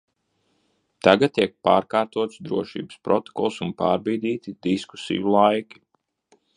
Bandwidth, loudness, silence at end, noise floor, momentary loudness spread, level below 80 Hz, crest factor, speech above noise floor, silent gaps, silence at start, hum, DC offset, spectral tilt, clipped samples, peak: 10.5 kHz; -23 LUFS; 0.95 s; -70 dBFS; 10 LU; -60 dBFS; 22 dB; 48 dB; none; 1.05 s; none; under 0.1%; -6 dB/octave; under 0.1%; 0 dBFS